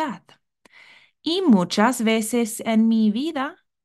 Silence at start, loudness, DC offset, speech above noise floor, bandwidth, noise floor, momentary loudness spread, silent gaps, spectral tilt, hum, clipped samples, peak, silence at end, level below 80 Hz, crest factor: 0 s; -21 LUFS; under 0.1%; 37 dB; 12.5 kHz; -57 dBFS; 12 LU; none; -5 dB/octave; none; under 0.1%; -6 dBFS; 0.3 s; -70 dBFS; 16 dB